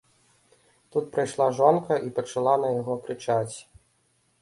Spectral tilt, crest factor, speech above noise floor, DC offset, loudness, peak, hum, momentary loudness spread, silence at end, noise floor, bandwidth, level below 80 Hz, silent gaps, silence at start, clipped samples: -6 dB/octave; 20 dB; 43 dB; under 0.1%; -25 LUFS; -6 dBFS; none; 10 LU; 0.8 s; -68 dBFS; 11.5 kHz; -68 dBFS; none; 0.95 s; under 0.1%